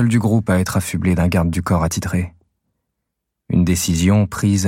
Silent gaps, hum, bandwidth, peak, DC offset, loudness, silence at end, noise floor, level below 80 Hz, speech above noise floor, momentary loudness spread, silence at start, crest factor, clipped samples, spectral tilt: none; none; 16.5 kHz; -4 dBFS; under 0.1%; -18 LUFS; 0 s; -78 dBFS; -36 dBFS; 61 dB; 6 LU; 0 s; 14 dB; under 0.1%; -6 dB/octave